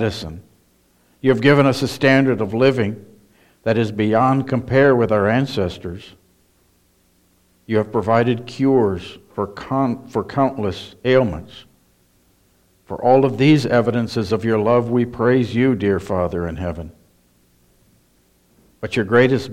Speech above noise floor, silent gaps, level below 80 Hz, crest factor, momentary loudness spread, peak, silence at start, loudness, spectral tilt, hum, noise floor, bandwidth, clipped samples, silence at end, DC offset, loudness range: 41 dB; none; -48 dBFS; 18 dB; 13 LU; -2 dBFS; 0 s; -18 LUFS; -7 dB/octave; none; -59 dBFS; 13.5 kHz; under 0.1%; 0 s; under 0.1%; 6 LU